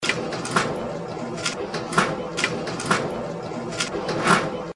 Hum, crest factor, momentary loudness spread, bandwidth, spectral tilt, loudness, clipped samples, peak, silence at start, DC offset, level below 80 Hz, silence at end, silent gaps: none; 20 dB; 10 LU; 11.5 kHz; -3.5 dB/octave; -25 LUFS; under 0.1%; -4 dBFS; 0 s; under 0.1%; -54 dBFS; 0.05 s; none